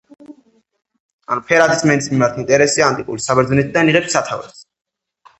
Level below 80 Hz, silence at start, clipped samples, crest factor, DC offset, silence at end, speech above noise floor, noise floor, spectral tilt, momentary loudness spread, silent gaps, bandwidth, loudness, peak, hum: -50 dBFS; 0.3 s; under 0.1%; 18 dB; under 0.1%; 0.8 s; 39 dB; -54 dBFS; -4.5 dB/octave; 10 LU; 1.00-1.19 s; 8.6 kHz; -15 LUFS; 0 dBFS; none